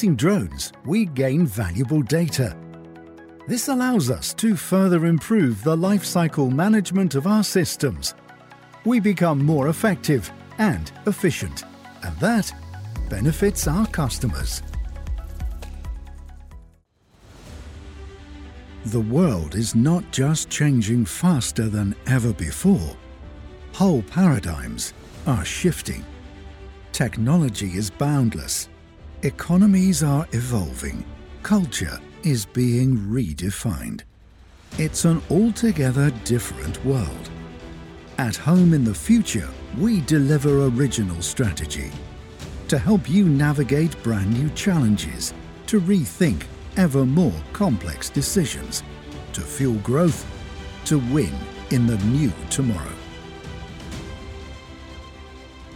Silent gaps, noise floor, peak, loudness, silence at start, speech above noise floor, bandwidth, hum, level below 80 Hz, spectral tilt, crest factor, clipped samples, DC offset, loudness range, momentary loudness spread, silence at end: none; -57 dBFS; -6 dBFS; -21 LUFS; 0 s; 37 dB; 17.5 kHz; none; -38 dBFS; -6 dB/octave; 16 dB; under 0.1%; under 0.1%; 5 LU; 19 LU; 0 s